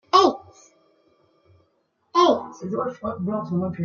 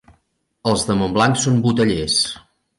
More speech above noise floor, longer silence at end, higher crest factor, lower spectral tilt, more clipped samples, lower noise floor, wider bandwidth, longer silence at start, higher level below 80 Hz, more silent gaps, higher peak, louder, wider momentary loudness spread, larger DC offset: second, 42 dB vs 48 dB; second, 0 s vs 0.4 s; first, 22 dB vs 16 dB; first, -6 dB/octave vs -4.5 dB/octave; neither; first, -69 dBFS vs -65 dBFS; second, 7.2 kHz vs 11.5 kHz; second, 0.15 s vs 0.65 s; second, -64 dBFS vs -44 dBFS; neither; about the same, -2 dBFS vs -4 dBFS; second, -22 LUFS vs -18 LUFS; first, 11 LU vs 7 LU; neither